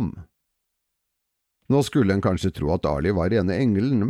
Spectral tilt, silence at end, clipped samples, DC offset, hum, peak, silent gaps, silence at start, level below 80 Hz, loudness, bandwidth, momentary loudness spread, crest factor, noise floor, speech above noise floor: -7.5 dB/octave; 0 s; under 0.1%; under 0.1%; none; -8 dBFS; none; 0 s; -42 dBFS; -22 LUFS; 14.5 kHz; 4 LU; 16 dB; -79 dBFS; 58 dB